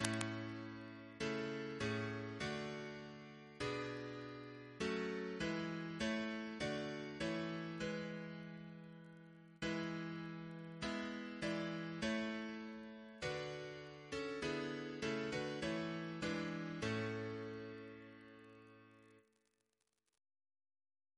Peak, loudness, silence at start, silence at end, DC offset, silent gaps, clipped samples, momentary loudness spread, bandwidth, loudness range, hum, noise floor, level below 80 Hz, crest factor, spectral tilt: -12 dBFS; -44 LUFS; 0 s; 1.95 s; under 0.1%; none; under 0.1%; 13 LU; 11 kHz; 4 LU; none; -87 dBFS; -70 dBFS; 32 dB; -5 dB/octave